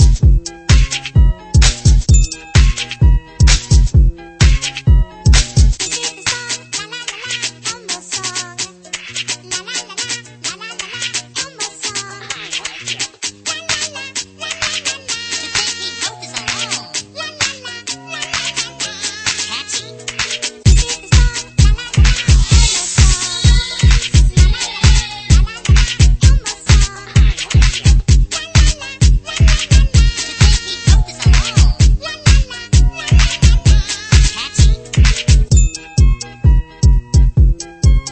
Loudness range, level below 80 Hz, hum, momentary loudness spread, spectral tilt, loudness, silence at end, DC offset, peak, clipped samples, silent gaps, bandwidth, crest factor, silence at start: 8 LU; -14 dBFS; none; 10 LU; -3.5 dB/octave; -15 LUFS; 0 s; under 0.1%; 0 dBFS; under 0.1%; none; 8.8 kHz; 12 dB; 0 s